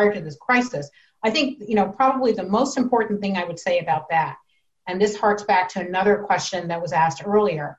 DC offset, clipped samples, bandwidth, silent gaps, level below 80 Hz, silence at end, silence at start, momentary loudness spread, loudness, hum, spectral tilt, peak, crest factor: under 0.1%; under 0.1%; 8.2 kHz; none; -60 dBFS; 0.05 s; 0 s; 7 LU; -22 LUFS; none; -5 dB/octave; -6 dBFS; 16 dB